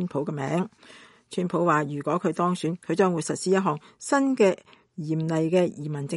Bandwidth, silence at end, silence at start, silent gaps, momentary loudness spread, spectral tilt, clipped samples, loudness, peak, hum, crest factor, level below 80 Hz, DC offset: 11.5 kHz; 0 s; 0 s; none; 11 LU; -6 dB/octave; under 0.1%; -25 LUFS; -8 dBFS; none; 18 dB; -72 dBFS; under 0.1%